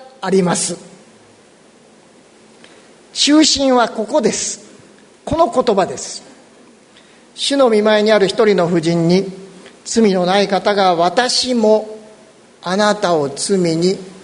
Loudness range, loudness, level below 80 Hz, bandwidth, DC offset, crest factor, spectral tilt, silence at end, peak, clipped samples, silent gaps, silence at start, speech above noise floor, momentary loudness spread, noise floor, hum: 5 LU; -14 LUFS; -50 dBFS; 11 kHz; under 0.1%; 16 dB; -4 dB/octave; 0.05 s; 0 dBFS; under 0.1%; none; 0 s; 33 dB; 15 LU; -47 dBFS; none